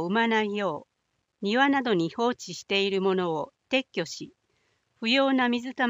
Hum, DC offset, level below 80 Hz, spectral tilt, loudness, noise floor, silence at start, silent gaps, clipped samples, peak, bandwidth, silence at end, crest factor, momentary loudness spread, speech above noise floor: none; under 0.1%; -74 dBFS; -4.5 dB/octave; -26 LUFS; -77 dBFS; 0 s; none; under 0.1%; -8 dBFS; 15.5 kHz; 0 s; 20 dB; 12 LU; 51 dB